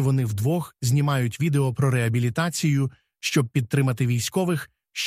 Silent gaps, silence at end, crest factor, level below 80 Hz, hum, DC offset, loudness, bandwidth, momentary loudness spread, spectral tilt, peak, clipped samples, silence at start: none; 0 s; 14 dB; -56 dBFS; none; under 0.1%; -24 LUFS; 15.5 kHz; 4 LU; -5.5 dB/octave; -8 dBFS; under 0.1%; 0 s